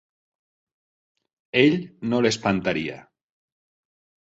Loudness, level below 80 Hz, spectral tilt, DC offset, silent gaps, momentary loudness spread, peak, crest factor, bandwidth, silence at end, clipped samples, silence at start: -22 LUFS; -58 dBFS; -5 dB/octave; under 0.1%; none; 9 LU; -4 dBFS; 22 dB; 8 kHz; 1.25 s; under 0.1%; 1.55 s